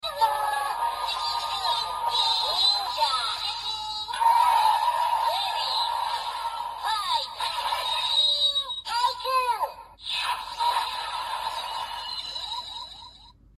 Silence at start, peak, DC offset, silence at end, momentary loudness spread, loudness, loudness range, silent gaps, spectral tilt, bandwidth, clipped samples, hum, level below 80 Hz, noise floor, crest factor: 0.05 s; -10 dBFS; under 0.1%; 0.25 s; 11 LU; -25 LUFS; 6 LU; none; 1 dB/octave; 15 kHz; under 0.1%; none; -58 dBFS; -51 dBFS; 16 dB